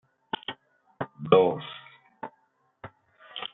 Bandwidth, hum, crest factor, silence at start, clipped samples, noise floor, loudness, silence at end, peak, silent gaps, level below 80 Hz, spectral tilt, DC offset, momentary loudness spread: 4 kHz; none; 24 dB; 0.5 s; under 0.1%; -69 dBFS; -27 LUFS; 0.05 s; -6 dBFS; none; -68 dBFS; -4 dB/octave; under 0.1%; 27 LU